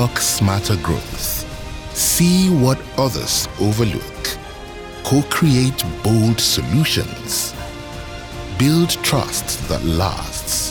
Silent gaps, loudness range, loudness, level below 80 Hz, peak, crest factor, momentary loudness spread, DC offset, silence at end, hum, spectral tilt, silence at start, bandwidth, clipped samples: none; 2 LU; -18 LUFS; -34 dBFS; -2 dBFS; 16 dB; 16 LU; under 0.1%; 0 s; none; -4 dB/octave; 0 s; over 20 kHz; under 0.1%